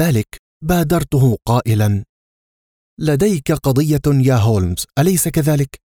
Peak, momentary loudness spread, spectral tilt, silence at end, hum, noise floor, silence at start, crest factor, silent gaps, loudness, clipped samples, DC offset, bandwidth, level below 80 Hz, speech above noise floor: -4 dBFS; 6 LU; -6.5 dB/octave; 0.15 s; none; under -90 dBFS; 0 s; 12 dB; 0.39-0.61 s, 2.09-2.97 s; -16 LUFS; under 0.1%; under 0.1%; 19 kHz; -36 dBFS; over 75 dB